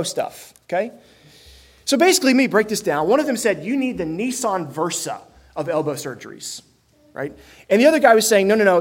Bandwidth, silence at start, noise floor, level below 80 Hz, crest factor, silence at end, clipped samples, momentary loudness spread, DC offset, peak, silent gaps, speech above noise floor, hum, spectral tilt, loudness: 16.5 kHz; 0 s; -48 dBFS; -58 dBFS; 20 dB; 0 s; under 0.1%; 18 LU; under 0.1%; 0 dBFS; none; 29 dB; none; -3.5 dB/octave; -18 LUFS